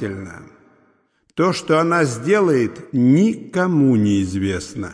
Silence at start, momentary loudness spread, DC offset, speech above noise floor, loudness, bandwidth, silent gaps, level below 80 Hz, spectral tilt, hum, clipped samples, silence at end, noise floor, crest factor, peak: 0 s; 11 LU; under 0.1%; 44 dB; -18 LUFS; 10.5 kHz; none; -54 dBFS; -6.5 dB/octave; none; under 0.1%; 0 s; -61 dBFS; 14 dB; -4 dBFS